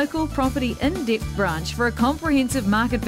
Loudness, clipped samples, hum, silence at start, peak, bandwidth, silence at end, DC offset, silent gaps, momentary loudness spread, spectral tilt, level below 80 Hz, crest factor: -22 LUFS; under 0.1%; none; 0 s; -8 dBFS; 16 kHz; 0 s; under 0.1%; none; 3 LU; -5.5 dB/octave; -34 dBFS; 14 dB